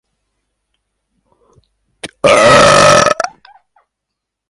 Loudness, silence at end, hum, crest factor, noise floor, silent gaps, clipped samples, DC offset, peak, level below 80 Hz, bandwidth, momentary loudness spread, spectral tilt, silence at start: -8 LUFS; 1.2 s; none; 14 dB; -77 dBFS; none; under 0.1%; under 0.1%; 0 dBFS; -42 dBFS; 13 kHz; 21 LU; -3 dB/octave; 2.05 s